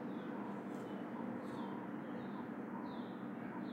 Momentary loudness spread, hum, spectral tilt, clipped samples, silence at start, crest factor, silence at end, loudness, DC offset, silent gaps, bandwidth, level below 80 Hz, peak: 1 LU; none; -8 dB/octave; under 0.1%; 0 s; 12 dB; 0 s; -46 LUFS; under 0.1%; none; 16 kHz; -86 dBFS; -32 dBFS